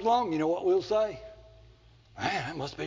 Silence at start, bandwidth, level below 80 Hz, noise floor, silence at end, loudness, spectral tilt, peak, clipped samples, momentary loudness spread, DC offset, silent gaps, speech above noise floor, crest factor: 0 s; 7.6 kHz; -58 dBFS; -57 dBFS; 0 s; -29 LUFS; -5.5 dB/octave; -14 dBFS; under 0.1%; 12 LU; under 0.1%; none; 29 dB; 16 dB